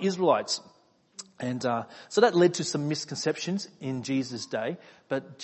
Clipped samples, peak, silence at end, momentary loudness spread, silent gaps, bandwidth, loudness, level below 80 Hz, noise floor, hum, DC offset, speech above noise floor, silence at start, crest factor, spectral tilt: under 0.1%; -6 dBFS; 0 s; 12 LU; none; 8.6 kHz; -28 LUFS; -74 dBFS; -49 dBFS; none; under 0.1%; 21 dB; 0 s; 22 dB; -4.5 dB/octave